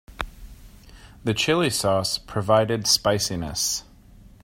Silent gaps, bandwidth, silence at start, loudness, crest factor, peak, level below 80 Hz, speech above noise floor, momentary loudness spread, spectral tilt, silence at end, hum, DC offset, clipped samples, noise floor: none; 16.5 kHz; 0.1 s; -22 LUFS; 20 dB; -6 dBFS; -46 dBFS; 26 dB; 12 LU; -3.5 dB/octave; 0.2 s; none; under 0.1%; under 0.1%; -49 dBFS